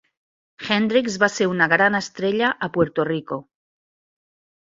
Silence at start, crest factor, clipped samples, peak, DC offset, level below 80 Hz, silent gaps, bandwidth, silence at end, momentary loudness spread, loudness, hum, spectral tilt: 0.6 s; 20 dB; under 0.1%; -2 dBFS; under 0.1%; -60 dBFS; none; 7.8 kHz; 1.25 s; 10 LU; -20 LUFS; none; -4.5 dB/octave